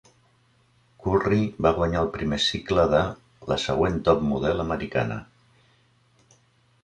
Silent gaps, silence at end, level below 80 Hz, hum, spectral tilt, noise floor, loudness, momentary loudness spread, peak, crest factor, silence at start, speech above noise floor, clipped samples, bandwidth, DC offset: none; 1.6 s; -42 dBFS; none; -6 dB/octave; -62 dBFS; -24 LUFS; 9 LU; -4 dBFS; 20 dB; 1 s; 39 dB; under 0.1%; 10.5 kHz; under 0.1%